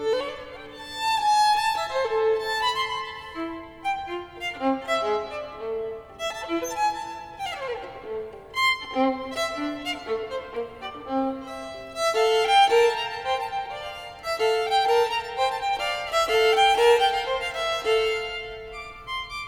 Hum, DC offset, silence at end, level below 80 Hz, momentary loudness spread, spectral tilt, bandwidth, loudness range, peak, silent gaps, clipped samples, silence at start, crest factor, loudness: none; under 0.1%; 0 s; -54 dBFS; 16 LU; -2 dB/octave; 19 kHz; 7 LU; -8 dBFS; none; under 0.1%; 0 s; 18 dB; -25 LUFS